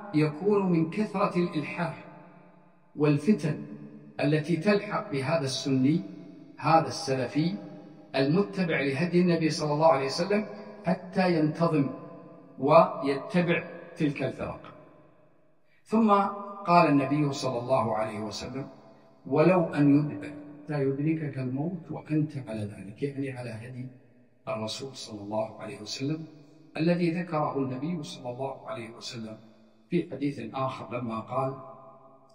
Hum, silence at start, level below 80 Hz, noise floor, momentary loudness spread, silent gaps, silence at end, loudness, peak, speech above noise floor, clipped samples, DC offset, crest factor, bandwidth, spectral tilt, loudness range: none; 0 s; -68 dBFS; -67 dBFS; 17 LU; none; 0.4 s; -28 LUFS; -6 dBFS; 39 dB; under 0.1%; under 0.1%; 22 dB; 11 kHz; -6.5 dB/octave; 8 LU